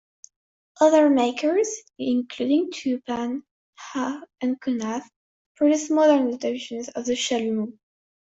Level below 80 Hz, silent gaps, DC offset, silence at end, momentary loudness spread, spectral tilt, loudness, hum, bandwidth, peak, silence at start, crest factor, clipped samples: -70 dBFS; 3.51-3.73 s, 5.16-5.55 s; under 0.1%; 0.65 s; 13 LU; -3.5 dB/octave; -23 LUFS; none; 8 kHz; -6 dBFS; 0.8 s; 18 dB; under 0.1%